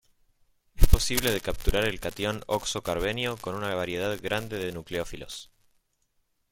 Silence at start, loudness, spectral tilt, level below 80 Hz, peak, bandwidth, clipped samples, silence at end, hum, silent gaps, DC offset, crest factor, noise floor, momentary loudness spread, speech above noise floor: 0.75 s; -29 LUFS; -4 dB/octave; -32 dBFS; 0 dBFS; 17 kHz; under 0.1%; 1.05 s; none; none; under 0.1%; 26 dB; -73 dBFS; 9 LU; 43 dB